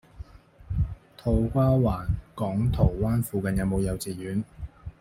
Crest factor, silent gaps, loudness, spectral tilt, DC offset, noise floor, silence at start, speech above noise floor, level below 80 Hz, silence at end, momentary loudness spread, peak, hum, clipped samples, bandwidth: 18 dB; none; -27 LUFS; -8 dB/octave; under 0.1%; -45 dBFS; 0.15 s; 20 dB; -36 dBFS; 0.1 s; 18 LU; -8 dBFS; none; under 0.1%; 16 kHz